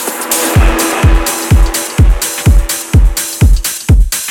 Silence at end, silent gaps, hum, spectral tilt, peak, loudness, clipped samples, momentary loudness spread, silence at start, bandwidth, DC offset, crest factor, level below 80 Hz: 0 s; none; none; -4 dB/octave; 0 dBFS; -11 LUFS; under 0.1%; 3 LU; 0 s; 19 kHz; under 0.1%; 8 dB; -12 dBFS